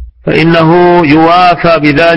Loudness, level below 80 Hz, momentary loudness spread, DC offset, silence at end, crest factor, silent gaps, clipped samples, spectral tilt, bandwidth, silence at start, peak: -6 LUFS; -32 dBFS; 3 LU; under 0.1%; 0 s; 6 dB; none; 2%; -7.5 dB/octave; 8.8 kHz; 0 s; 0 dBFS